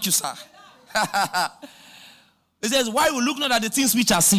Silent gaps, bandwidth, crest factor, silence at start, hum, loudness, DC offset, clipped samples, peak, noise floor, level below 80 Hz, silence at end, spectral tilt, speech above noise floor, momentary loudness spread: none; 16 kHz; 12 dB; 0 s; none; -21 LUFS; under 0.1%; under 0.1%; -10 dBFS; -57 dBFS; -58 dBFS; 0 s; -2 dB/octave; 35 dB; 10 LU